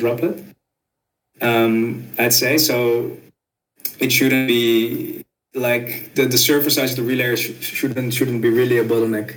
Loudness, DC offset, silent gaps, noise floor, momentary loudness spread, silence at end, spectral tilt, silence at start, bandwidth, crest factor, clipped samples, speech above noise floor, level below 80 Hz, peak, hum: -18 LUFS; under 0.1%; none; -79 dBFS; 11 LU; 0 s; -4 dB/octave; 0 s; 17.5 kHz; 18 dB; under 0.1%; 61 dB; -68 dBFS; 0 dBFS; none